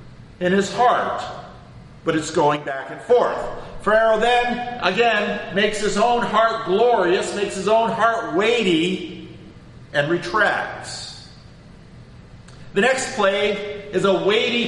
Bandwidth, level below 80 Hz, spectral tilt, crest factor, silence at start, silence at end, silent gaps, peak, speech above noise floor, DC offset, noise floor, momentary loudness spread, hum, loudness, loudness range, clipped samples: 11.5 kHz; -48 dBFS; -4 dB/octave; 18 dB; 0 s; 0 s; none; -2 dBFS; 24 dB; under 0.1%; -43 dBFS; 12 LU; none; -20 LUFS; 5 LU; under 0.1%